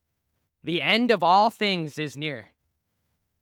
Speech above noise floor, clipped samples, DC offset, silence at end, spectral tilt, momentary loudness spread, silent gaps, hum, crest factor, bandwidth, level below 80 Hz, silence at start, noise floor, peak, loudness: 53 dB; under 0.1%; under 0.1%; 1 s; -5 dB/octave; 13 LU; none; none; 20 dB; 18 kHz; -74 dBFS; 0.65 s; -77 dBFS; -6 dBFS; -23 LUFS